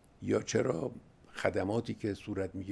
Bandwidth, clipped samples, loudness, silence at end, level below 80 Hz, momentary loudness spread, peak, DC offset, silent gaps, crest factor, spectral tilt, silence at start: 11 kHz; under 0.1%; -34 LUFS; 0 s; -64 dBFS; 9 LU; -14 dBFS; under 0.1%; none; 22 dB; -5.5 dB/octave; 0.2 s